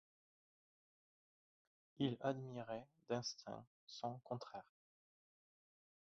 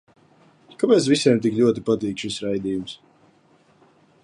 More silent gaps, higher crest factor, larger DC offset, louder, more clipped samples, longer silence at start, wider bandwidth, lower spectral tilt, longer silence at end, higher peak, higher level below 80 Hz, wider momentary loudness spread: first, 3.67-3.87 s vs none; first, 24 dB vs 18 dB; neither; second, -47 LUFS vs -21 LUFS; neither; first, 2 s vs 0.8 s; second, 7.4 kHz vs 11.5 kHz; about the same, -5 dB/octave vs -5.5 dB/octave; first, 1.5 s vs 1.3 s; second, -26 dBFS vs -4 dBFS; second, -86 dBFS vs -60 dBFS; about the same, 13 LU vs 12 LU